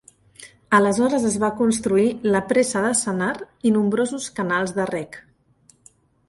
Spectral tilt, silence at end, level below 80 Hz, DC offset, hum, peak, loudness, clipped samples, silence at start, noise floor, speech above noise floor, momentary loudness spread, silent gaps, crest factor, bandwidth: -4.5 dB/octave; 1.1 s; -58 dBFS; under 0.1%; none; -4 dBFS; -21 LUFS; under 0.1%; 0.4 s; -58 dBFS; 37 dB; 7 LU; none; 18 dB; 11.5 kHz